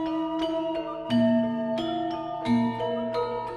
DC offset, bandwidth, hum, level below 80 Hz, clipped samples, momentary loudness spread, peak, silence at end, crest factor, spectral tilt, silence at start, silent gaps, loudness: under 0.1%; 9.6 kHz; none; -58 dBFS; under 0.1%; 7 LU; -14 dBFS; 0 s; 14 dB; -7 dB/octave; 0 s; none; -27 LUFS